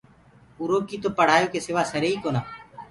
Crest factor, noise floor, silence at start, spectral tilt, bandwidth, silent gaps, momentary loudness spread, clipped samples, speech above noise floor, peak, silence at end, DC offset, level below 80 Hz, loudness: 22 dB; -54 dBFS; 0.6 s; -5 dB/octave; 11.5 kHz; none; 14 LU; under 0.1%; 31 dB; -4 dBFS; 0.05 s; under 0.1%; -58 dBFS; -24 LUFS